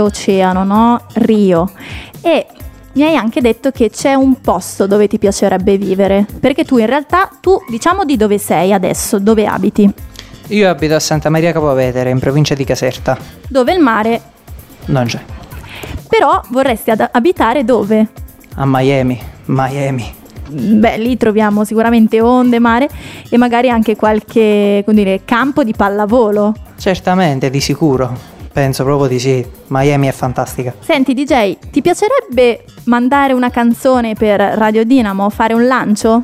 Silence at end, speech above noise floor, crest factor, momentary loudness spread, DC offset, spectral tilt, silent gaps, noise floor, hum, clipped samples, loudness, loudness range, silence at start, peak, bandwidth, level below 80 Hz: 0 s; 22 dB; 12 dB; 8 LU; under 0.1%; -6 dB/octave; none; -33 dBFS; none; under 0.1%; -12 LUFS; 3 LU; 0 s; 0 dBFS; 16 kHz; -36 dBFS